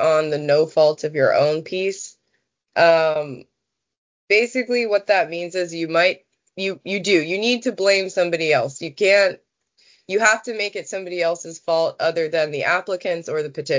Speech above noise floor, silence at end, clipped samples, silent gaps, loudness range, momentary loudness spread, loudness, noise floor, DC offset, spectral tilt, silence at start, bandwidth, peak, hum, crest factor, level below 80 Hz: 59 dB; 0 s; under 0.1%; 3.98-4.28 s; 2 LU; 10 LU; -20 LUFS; -79 dBFS; under 0.1%; -3.5 dB/octave; 0 s; 7.8 kHz; -2 dBFS; none; 18 dB; -72 dBFS